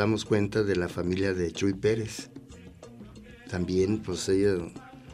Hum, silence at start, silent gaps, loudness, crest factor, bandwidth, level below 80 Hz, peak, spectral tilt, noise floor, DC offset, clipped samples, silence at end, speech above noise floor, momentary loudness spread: none; 0 s; none; -28 LUFS; 18 dB; 14.5 kHz; -52 dBFS; -12 dBFS; -6 dB/octave; -47 dBFS; under 0.1%; under 0.1%; 0 s; 20 dB; 22 LU